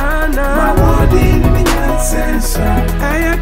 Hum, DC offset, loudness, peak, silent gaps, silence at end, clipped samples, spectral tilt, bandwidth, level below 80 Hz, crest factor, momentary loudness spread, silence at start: none; under 0.1%; -13 LUFS; 0 dBFS; none; 0 s; under 0.1%; -5.5 dB/octave; 16.5 kHz; -14 dBFS; 10 dB; 4 LU; 0 s